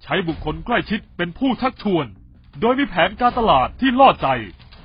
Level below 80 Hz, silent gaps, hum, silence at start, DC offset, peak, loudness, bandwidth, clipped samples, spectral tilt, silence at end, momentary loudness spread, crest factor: -40 dBFS; none; none; 0.05 s; under 0.1%; 0 dBFS; -19 LUFS; 5.2 kHz; under 0.1%; -3.5 dB/octave; 0.35 s; 12 LU; 18 dB